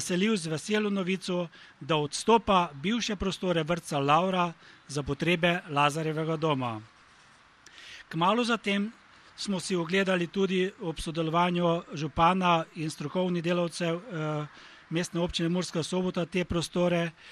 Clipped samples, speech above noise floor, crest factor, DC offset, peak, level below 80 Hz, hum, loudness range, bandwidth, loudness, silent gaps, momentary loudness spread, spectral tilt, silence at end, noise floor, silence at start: under 0.1%; 29 dB; 20 dB; under 0.1%; -10 dBFS; -54 dBFS; none; 4 LU; 12.5 kHz; -28 LUFS; none; 10 LU; -5 dB/octave; 0 s; -58 dBFS; 0 s